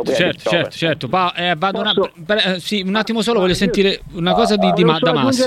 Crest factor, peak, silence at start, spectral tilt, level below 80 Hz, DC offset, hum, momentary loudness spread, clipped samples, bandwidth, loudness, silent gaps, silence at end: 16 dB; 0 dBFS; 0 s; -5 dB/octave; -44 dBFS; under 0.1%; none; 5 LU; under 0.1%; 15 kHz; -16 LUFS; none; 0 s